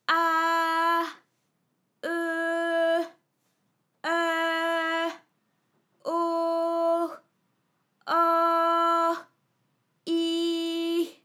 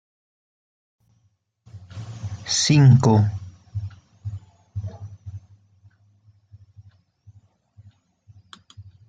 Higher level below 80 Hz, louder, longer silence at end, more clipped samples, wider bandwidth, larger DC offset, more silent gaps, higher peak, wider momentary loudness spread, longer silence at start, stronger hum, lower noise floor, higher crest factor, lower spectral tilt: second, under -90 dBFS vs -58 dBFS; second, -26 LUFS vs -19 LUFS; second, 0.15 s vs 0.3 s; neither; first, 16 kHz vs 9.2 kHz; neither; neither; second, -10 dBFS vs -4 dBFS; second, 13 LU vs 27 LU; second, 0.1 s vs 1.75 s; neither; first, -75 dBFS vs -67 dBFS; about the same, 18 dB vs 20 dB; second, -2 dB/octave vs -5.5 dB/octave